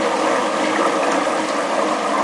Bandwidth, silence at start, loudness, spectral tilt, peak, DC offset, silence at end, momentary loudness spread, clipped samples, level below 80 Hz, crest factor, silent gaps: 11.5 kHz; 0 s; -19 LUFS; -3 dB/octave; -4 dBFS; under 0.1%; 0 s; 2 LU; under 0.1%; -64 dBFS; 14 dB; none